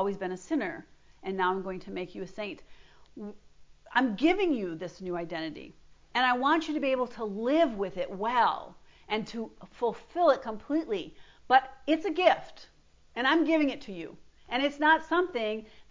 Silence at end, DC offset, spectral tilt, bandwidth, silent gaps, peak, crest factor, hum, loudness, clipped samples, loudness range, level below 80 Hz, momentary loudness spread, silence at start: 0.1 s; under 0.1%; -5 dB/octave; 7.6 kHz; none; -8 dBFS; 22 dB; none; -29 LUFS; under 0.1%; 4 LU; -62 dBFS; 17 LU; 0 s